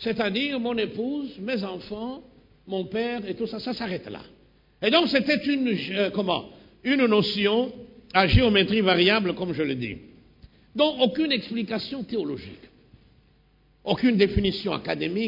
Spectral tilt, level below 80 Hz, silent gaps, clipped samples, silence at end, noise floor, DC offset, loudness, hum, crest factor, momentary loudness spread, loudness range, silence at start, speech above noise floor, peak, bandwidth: -7 dB/octave; -44 dBFS; none; under 0.1%; 0 s; -60 dBFS; under 0.1%; -24 LUFS; none; 22 dB; 14 LU; 9 LU; 0 s; 36 dB; -4 dBFS; 5.4 kHz